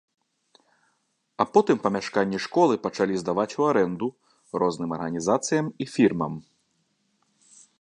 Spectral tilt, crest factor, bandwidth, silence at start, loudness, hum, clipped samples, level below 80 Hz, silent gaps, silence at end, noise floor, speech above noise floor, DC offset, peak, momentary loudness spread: -5.5 dB/octave; 22 dB; 11 kHz; 1.4 s; -25 LUFS; none; under 0.1%; -64 dBFS; none; 1.4 s; -72 dBFS; 49 dB; under 0.1%; -4 dBFS; 9 LU